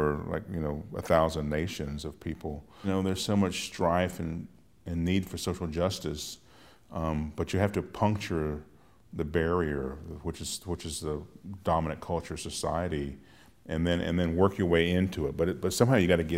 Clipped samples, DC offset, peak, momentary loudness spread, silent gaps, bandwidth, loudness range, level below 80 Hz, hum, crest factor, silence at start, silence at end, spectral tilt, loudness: under 0.1%; under 0.1%; -8 dBFS; 13 LU; none; 16 kHz; 5 LU; -50 dBFS; none; 22 dB; 0 s; 0 s; -5.5 dB/octave; -30 LUFS